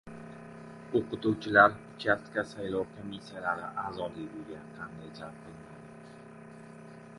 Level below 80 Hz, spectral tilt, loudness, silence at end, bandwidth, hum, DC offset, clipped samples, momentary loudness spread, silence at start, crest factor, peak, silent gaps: -64 dBFS; -6 dB/octave; -30 LUFS; 0 s; 11.5 kHz; none; under 0.1%; under 0.1%; 24 LU; 0.05 s; 26 dB; -6 dBFS; none